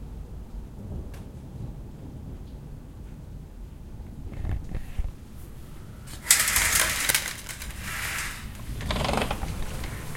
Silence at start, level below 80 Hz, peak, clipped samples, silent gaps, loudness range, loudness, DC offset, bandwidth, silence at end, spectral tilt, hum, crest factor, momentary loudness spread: 0 s; -38 dBFS; 0 dBFS; under 0.1%; none; 17 LU; -26 LUFS; under 0.1%; 17 kHz; 0 s; -2 dB/octave; none; 30 dB; 23 LU